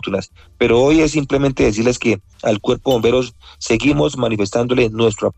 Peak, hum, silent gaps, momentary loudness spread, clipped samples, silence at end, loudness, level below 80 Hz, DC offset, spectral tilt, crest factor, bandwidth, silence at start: -4 dBFS; none; none; 7 LU; under 0.1%; 0.05 s; -16 LUFS; -36 dBFS; under 0.1%; -5.5 dB/octave; 12 dB; 14.5 kHz; 0.05 s